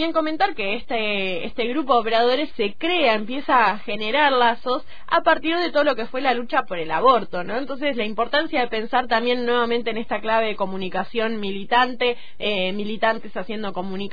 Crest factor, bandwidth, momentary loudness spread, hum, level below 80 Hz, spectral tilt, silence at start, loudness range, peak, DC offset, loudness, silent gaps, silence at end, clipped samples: 18 dB; 5 kHz; 9 LU; none; -52 dBFS; -6.5 dB/octave; 0 s; 3 LU; -6 dBFS; 4%; -22 LUFS; none; 0 s; under 0.1%